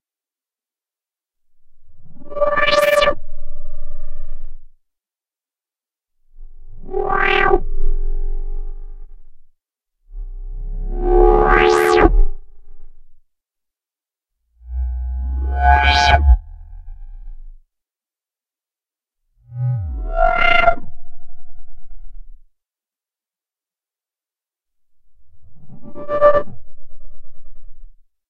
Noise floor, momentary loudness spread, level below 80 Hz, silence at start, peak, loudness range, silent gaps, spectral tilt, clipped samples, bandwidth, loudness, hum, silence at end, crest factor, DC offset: under -90 dBFS; 24 LU; -24 dBFS; 1.65 s; 0 dBFS; 14 LU; none; -5.5 dB/octave; under 0.1%; 13.5 kHz; -16 LUFS; none; 0.35 s; 18 dB; under 0.1%